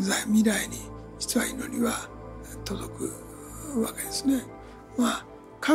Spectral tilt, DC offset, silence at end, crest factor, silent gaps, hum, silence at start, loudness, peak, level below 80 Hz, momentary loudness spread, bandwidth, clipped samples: -3.5 dB/octave; under 0.1%; 0 s; 18 dB; none; none; 0 s; -28 LUFS; -10 dBFS; -50 dBFS; 18 LU; 16 kHz; under 0.1%